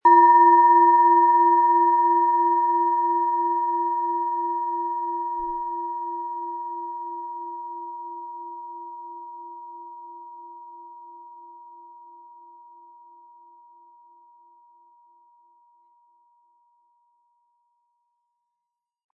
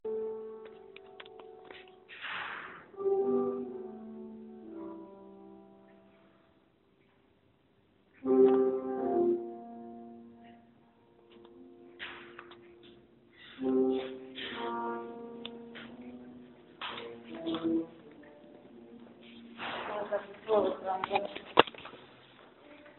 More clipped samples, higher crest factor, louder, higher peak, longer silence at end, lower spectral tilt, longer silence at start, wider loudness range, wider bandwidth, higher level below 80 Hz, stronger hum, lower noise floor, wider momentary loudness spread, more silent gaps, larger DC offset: neither; second, 18 dB vs 36 dB; first, -20 LUFS vs -33 LUFS; second, -6 dBFS vs 0 dBFS; first, 7.55 s vs 0.05 s; first, -7.5 dB/octave vs -2.5 dB/octave; about the same, 0.05 s vs 0.05 s; first, 25 LU vs 18 LU; second, 2 kHz vs 4.3 kHz; about the same, -70 dBFS vs -74 dBFS; neither; first, -84 dBFS vs -68 dBFS; about the same, 26 LU vs 25 LU; neither; neither